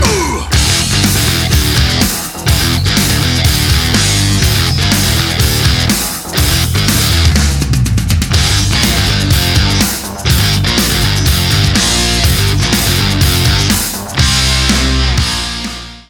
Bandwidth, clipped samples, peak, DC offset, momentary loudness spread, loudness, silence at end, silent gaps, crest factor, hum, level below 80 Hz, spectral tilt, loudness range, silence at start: 19.5 kHz; under 0.1%; 0 dBFS; under 0.1%; 4 LU; -11 LUFS; 0.1 s; none; 12 dB; none; -18 dBFS; -3.5 dB/octave; 1 LU; 0 s